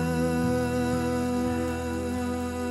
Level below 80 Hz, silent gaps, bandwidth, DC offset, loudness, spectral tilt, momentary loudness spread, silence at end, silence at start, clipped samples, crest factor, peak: -42 dBFS; none; 14.5 kHz; under 0.1%; -28 LUFS; -6.5 dB/octave; 4 LU; 0 s; 0 s; under 0.1%; 12 dB; -14 dBFS